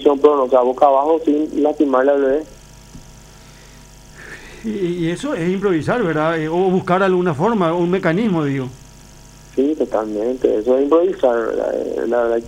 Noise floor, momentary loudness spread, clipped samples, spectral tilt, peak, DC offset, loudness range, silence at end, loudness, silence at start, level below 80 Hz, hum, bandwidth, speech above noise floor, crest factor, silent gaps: -41 dBFS; 9 LU; under 0.1%; -7 dB/octave; 0 dBFS; under 0.1%; 6 LU; 0 s; -17 LUFS; 0 s; -46 dBFS; none; 15 kHz; 25 dB; 16 dB; none